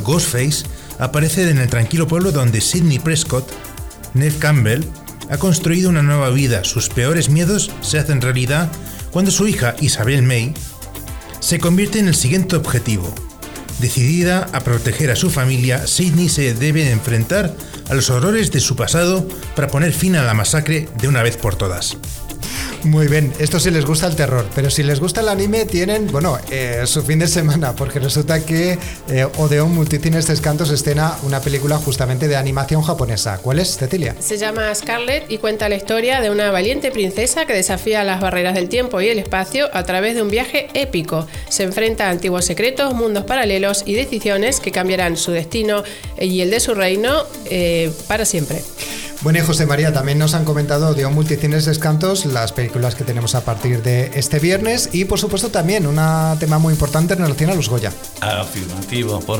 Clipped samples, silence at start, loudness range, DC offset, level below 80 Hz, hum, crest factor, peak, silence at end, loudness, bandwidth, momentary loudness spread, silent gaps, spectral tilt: under 0.1%; 0 s; 2 LU; under 0.1%; -34 dBFS; none; 12 dB; -6 dBFS; 0 s; -17 LUFS; 20 kHz; 7 LU; none; -4.5 dB/octave